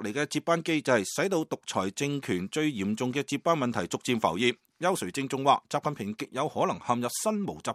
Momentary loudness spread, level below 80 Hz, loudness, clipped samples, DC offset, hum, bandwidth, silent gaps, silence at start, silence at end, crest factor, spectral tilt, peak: 6 LU; -68 dBFS; -29 LUFS; under 0.1%; under 0.1%; none; 15.5 kHz; none; 0 s; 0 s; 20 dB; -4.5 dB/octave; -8 dBFS